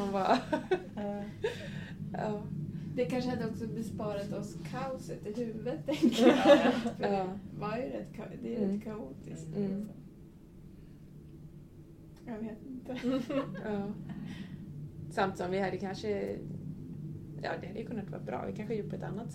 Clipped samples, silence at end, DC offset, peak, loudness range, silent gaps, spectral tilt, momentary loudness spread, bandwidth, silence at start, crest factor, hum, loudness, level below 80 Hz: under 0.1%; 0 s; under 0.1%; -8 dBFS; 12 LU; none; -6.5 dB/octave; 22 LU; 15.5 kHz; 0 s; 26 dB; none; -34 LUFS; -60 dBFS